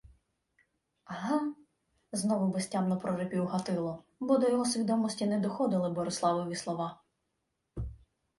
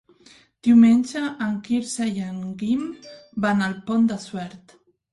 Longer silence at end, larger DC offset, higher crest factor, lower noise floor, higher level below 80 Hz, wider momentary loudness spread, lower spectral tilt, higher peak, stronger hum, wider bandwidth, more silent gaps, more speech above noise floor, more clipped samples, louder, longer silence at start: about the same, 0.45 s vs 0.55 s; neither; about the same, 18 dB vs 16 dB; first, -82 dBFS vs -53 dBFS; first, -56 dBFS vs -62 dBFS; second, 11 LU vs 19 LU; about the same, -5.5 dB/octave vs -5.5 dB/octave; second, -14 dBFS vs -6 dBFS; neither; about the same, 11.5 kHz vs 11.5 kHz; neither; first, 51 dB vs 32 dB; neither; second, -32 LUFS vs -22 LUFS; second, 0.05 s vs 0.65 s